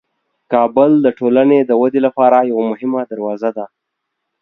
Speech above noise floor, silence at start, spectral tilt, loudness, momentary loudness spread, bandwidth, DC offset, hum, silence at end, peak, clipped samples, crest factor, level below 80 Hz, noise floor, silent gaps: 62 dB; 0.5 s; -9.5 dB/octave; -14 LUFS; 10 LU; 4.1 kHz; under 0.1%; none; 0.75 s; 0 dBFS; under 0.1%; 14 dB; -64 dBFS; -75 dBFS; none